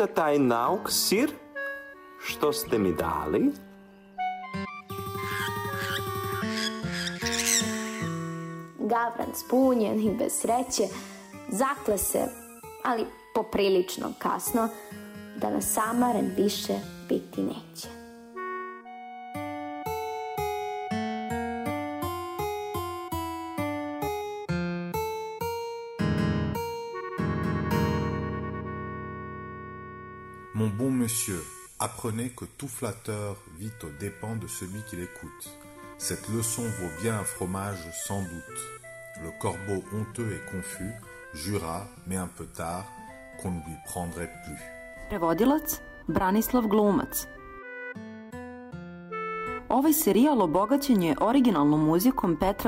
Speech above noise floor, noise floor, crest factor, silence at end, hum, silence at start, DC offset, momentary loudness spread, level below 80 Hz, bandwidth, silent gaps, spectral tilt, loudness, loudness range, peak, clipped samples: 23 dB; -51 dBFS; 18 dB; 0 s; none; 0 s; under 0.1%; 17 LU; -52 dBFS; 16 kHz; none; -4.5 dB/octave; -29 LUFS; 8 LU; -10 dBFS; under 0.1%